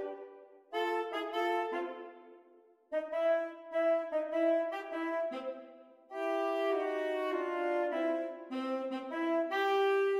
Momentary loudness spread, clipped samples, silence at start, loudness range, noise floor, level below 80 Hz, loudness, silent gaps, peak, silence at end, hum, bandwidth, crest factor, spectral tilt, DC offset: 12 LU; under 0.1%; 0 s; 2 LU; -63 dBFS; -86 dBFS; -34 LUFS; none; -20 dBFS; 0 s; none; 15 kHz; 14 dB; -3 dB/octave; under 0.1%